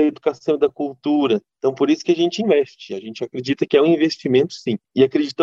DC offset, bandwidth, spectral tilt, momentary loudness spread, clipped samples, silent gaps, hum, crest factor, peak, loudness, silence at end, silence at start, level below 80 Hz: under 0.1%; 7.6 kHz; -6 dB/octave; 10 LU; under 0.1%; none; none; 16 dB; -2 dBFS; -19 LUFS; 0 s; 0 s; -66 dBFS